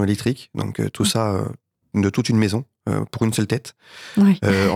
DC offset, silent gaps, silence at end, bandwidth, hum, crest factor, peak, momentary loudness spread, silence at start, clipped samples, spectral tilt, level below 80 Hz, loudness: under 0.1%; none; 0 s; 15.5 kHz; none; 16 dB; -4 dBFS; 10 LU; 0 s; under 0.1%; -5.5 dB/octave; -56 dBFS; -21 LUFS